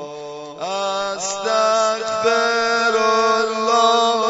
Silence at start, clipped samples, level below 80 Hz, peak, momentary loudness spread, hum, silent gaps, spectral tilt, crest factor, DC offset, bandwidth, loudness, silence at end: 0 s; under 0.1%; -64 dBFS; -4 dBFS; 12 LU; none; none; -1.5 dB/octave; 14 dB; under 0.1%; 8 kHz; -18 LUFS; 0 s